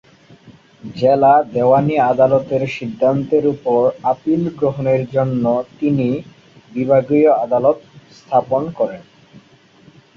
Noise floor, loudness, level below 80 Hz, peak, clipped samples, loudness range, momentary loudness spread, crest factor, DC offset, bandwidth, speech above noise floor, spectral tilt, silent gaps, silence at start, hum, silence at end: -48 dBFS; -16 LUFS; -54 dBFS; -2 dBFS; under 0.1%; 3 LU; 9 LU; 16 dB; under 0.1%; 7 kHz; 33 dB; -9 dB/octave; none; 0.5 s; none; 1.15 s